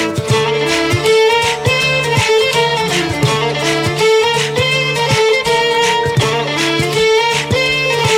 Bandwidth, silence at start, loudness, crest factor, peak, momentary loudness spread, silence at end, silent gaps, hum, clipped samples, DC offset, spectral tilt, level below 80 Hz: 16.5 kHz; 0 s; -13 LUFS; 12 dB; -2 dBFS; 3 LU; 0 s; none; none; under 0.1%; under 0.1%; -3.5 dB/octave; -40 dBFS